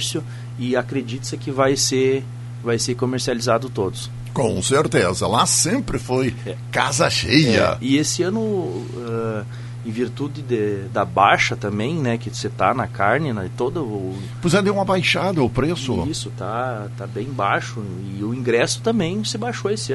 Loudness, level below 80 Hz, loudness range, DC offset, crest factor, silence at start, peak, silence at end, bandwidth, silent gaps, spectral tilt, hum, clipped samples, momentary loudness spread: -21 LUFS; -46 dBFS; 5 LU; under 0.1%; 20 dB; 0 s; 0 dBFS; 0 s; 12 kHz; none; -4.5 dB/octave; none; under 0.1%; 11 LU